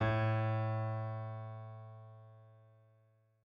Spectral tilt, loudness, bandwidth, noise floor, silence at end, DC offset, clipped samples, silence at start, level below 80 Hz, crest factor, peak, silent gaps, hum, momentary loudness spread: -9 dB/octave; -38 LUFS; 5 kHz; -71 dBFS; 0.9 s; under 0.1%; under 0.1%; 0 s; -66 dBFS; 16 dB; -22 dBFS; none; none; 23 LU